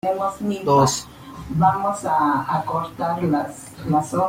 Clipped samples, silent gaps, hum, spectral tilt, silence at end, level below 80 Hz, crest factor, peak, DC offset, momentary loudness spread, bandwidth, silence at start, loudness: under 0.1%; none; none; -5.5 dB/octave; 0 s; -50 dBFS; 18 dB; -4 dBFS; under 0.1%; 12 LU; 16.5 kHz; 0.05 s; -21 LUFS